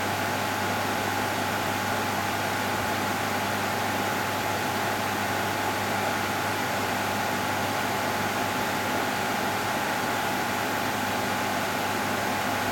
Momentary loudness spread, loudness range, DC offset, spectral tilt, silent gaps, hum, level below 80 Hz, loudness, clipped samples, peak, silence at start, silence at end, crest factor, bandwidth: 0 LU; 0 LU; under 0.1%; -3.5 dB/octave; none; none; -58 dBFS; -27 LUFS; under 0.1%; -14 dBFS; 0 s; 0 s; 14 dB; 18 kHz